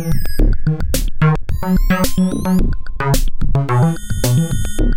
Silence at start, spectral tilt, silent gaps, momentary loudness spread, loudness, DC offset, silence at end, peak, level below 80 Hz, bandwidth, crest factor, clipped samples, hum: 0 s; -6 dB/octave; none; 5 LU; -18 LUFS; 5%; 0 s; 0 dBFS; -18 dBFS; 16.5 kHz; 12 dB; under 0.1%; none